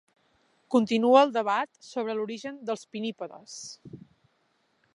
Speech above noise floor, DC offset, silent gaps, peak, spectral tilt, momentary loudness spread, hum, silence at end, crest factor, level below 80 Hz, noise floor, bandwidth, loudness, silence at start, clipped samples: 44 dB; under 0.1%; none; -6 dBFS; -4.5 dB/octave; 20 LU; none; 1 s; 24 dB; -78 dBFS; -71 dBFS; 11 kHz; -26 LUFS; 0.7 s; under 0.1%